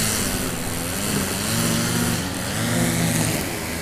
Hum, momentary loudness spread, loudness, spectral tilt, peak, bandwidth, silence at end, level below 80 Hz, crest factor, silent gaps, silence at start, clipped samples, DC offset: none; 5 LU; -22 LUFS; -3.5 dB/octave; -6 dBFS; 16 kHz; 0 s; -40 dBFS; 16 dB; none; 0 s; under 0.1%; under 0.1%